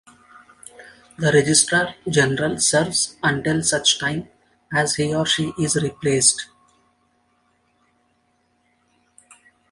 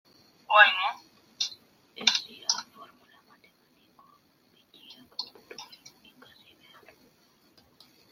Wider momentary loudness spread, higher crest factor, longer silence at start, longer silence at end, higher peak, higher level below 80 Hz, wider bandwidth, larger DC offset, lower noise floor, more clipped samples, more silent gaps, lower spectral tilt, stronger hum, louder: second, 8 LU vs 28 LU; second, 20 dB vs 28 dB; first, 0.8 s vs 0.5 s; first, 3.25 s vs 2.5 s; about the same, -2 dBFS vs -4 dBFS; first, -54 dBFS vs -84 dBFS; second, 11.5 kHz vs 16.5 kHz; neither; about the same, -65 dBFS vs -65 dBFS; neither; neither; first, -3 dB/octave vs 1.5 dB/octave; neither; first, -19 LUFS vs -25 LUFS